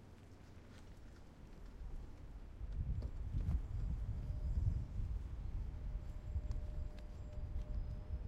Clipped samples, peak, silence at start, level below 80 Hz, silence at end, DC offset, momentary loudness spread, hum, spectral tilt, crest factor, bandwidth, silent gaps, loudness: under 0.1%; -24 dBFS; 0 s; -44 dBFS; 0 s; under 0.1%; 17 LU; none; -8.5 dB/octave; 18 dB; 8 kHz; none; -46 LUFS